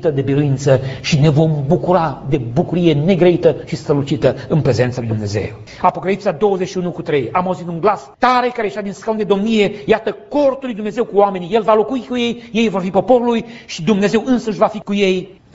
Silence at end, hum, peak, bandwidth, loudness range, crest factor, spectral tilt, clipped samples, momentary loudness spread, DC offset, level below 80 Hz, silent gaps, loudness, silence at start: 0.2 s; none; 0 dBFS; 8 kHz; 3 LU; 16 dB; -6 dB/octave; under 0.1%; 8 LU; under 0.1%; -44 dBFS; none; -16 LUFS; 0 s